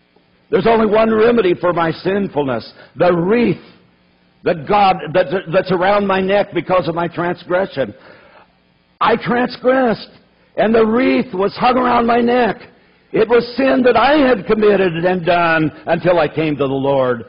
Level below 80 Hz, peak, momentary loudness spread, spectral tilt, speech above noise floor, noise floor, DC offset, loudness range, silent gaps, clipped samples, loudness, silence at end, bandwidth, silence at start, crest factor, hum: -46 dBFS; -4 dBFS; 8 LU; -10 dB/octave; 41 dB; -56 dBFS; under 0.1%; 5 LU; none; under 0.1%; -15 LUFS; 0.05 s; 5.4 kHz; 0.5 s; 12 dB; none